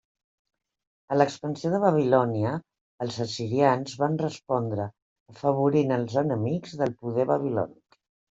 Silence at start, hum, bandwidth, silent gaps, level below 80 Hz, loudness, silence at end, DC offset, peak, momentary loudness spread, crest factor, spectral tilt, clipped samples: 1.1 s; none; 8 kHz; 2.81-2.98 s, 5.02-5.26 s; -68 dBFS; -26 LUFS; 0.65 s; under 0.1%; -6 dBFS; 9 LU; 20 dB; -7 dB/octave; under 0.1%